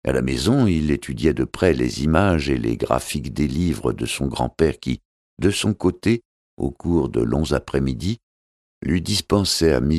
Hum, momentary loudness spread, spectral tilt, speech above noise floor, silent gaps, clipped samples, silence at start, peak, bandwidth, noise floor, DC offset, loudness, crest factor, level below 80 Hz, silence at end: none; 9 LU; -5.5 dB/octave; over 70 dB; 5.05-5.37 s, 6.25-6.57 s, 8.23-8.81 s; under 0.1%; 0.05 s; -2 dBFS; 14.5 kHz; under -90 dBFS; under 0.1%; -21 LUFS; 20 dB; -34 dBFS; 0 s